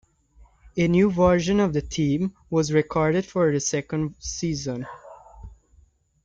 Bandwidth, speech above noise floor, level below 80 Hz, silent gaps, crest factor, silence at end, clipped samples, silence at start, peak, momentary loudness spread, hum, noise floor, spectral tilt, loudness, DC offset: 9 kHz; 36 dB; -46 dBFS; none; 18 dB; 0.7 s; under 0.1%; 0.65 s; -6 dBFS; 11 LU; none; -59 dBFS; -5.5 dB/octave; -23 LUFS; under 0.1%